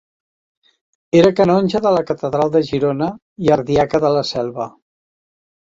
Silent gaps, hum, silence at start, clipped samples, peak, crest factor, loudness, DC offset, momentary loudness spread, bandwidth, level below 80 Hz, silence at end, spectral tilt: 3.22-3.36 s; none; 1.15 s; under 0.1%; -2 dBFS; 16 dB; -16 LUFS; under 0.1%; 10 LU; 7.8 kHz; -50 dBFS; 1.05 s; -7 dB/octave